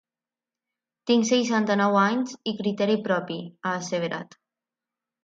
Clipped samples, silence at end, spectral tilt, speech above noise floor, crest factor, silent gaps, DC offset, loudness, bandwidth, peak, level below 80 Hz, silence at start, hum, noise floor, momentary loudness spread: under 0.1%; 1 s; -4.5 dB/octave; over 66 dB; 18 dB; none; under 0.1%; -24 LUFS; 7.8 kHz; -8 dBFS; -74 dBFS; 1.05 s; none; under -90 dBFS; 11 LU